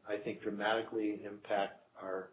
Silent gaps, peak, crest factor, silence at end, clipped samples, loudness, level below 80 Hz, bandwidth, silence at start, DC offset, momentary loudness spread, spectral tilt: none; -20 dBFS; 18 dB; 0 s; under 0.1%; -38 LUFS; -78 dBFS; 4 kHz; 0.05 s; under 0.1%; 9 LU; -2.5 dB/octave